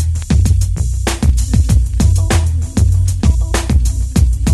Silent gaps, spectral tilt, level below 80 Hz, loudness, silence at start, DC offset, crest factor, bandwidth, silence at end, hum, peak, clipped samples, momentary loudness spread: none; -5.5 dB/octave; -16 dBFS; -14 LUFS; 0 s; under 0.1%; 12 dB; 12.5 kHz; 0 s; none; 0 dBFS; under 0.1%; 3 LU